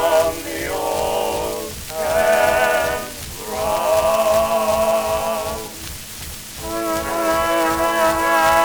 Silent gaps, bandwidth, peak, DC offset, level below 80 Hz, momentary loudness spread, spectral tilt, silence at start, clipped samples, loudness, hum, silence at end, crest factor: none; over 20 kHz; -2 dBFS; under 0.1%; -40 dBFS; 13 LU; -3 dB/octave; 0 s; under 0.1%; -19 LUFS; none; 0 s; 16 dB